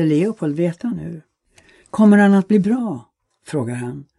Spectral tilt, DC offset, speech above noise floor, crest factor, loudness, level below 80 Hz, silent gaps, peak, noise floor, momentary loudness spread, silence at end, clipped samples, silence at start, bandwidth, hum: -8 dB/octave; under 0.1%; 37 dB; 16 dB; -17 LUFS; -58 dBFS; none; -2 dBFS; -54 dBFS; 17 LU; 0.15 s; under 0.1%; 0 s; 11 kHz; none